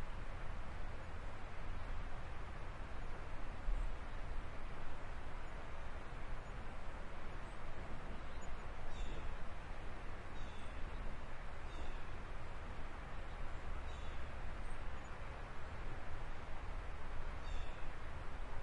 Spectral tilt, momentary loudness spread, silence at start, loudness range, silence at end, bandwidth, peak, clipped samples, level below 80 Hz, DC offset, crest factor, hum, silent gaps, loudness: -5.5 dB/octave; 2 LU; 0 s; 1 LU; 0 s; 8.6 kHz; -26 dBFS; under 0.1%; -46 dBFS; under 0.1%; 14 dB; none; none; -51 LUFS